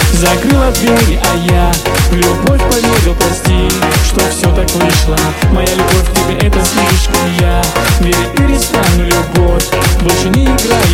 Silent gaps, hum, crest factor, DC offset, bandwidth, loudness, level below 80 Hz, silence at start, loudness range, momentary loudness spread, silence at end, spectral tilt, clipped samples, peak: none; none; 10 dB; under 0.1%; 17 kHz; -10 LUFS; -14 dBFS; 0 s; 1 LU; 2 LU; 0 s; -4.5 dB/octave; under 0.1%; 0 dBFS